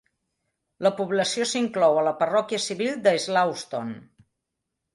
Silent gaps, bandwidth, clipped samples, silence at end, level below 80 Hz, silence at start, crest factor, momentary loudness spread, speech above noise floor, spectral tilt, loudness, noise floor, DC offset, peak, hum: none; 11.5 kHz; under 0.1%; 0.9 s; -72 dBFS; 0.8 s; 18 dB; 11 LU; 59 dB; -3.5 dB/octave; -24 LUFS; -82 dBFS; under 0.1%; -6 dBFS; none